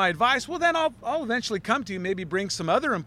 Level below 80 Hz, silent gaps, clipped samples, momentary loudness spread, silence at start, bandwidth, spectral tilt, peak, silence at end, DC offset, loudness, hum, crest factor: -58 dBFS; none; under 0.1%; 6 LU; 0 s; 14.5 kHz; -4 dB/octave; -8 dBFS; 0 s; under 0.1%; -25 LUFS; none; 18 dB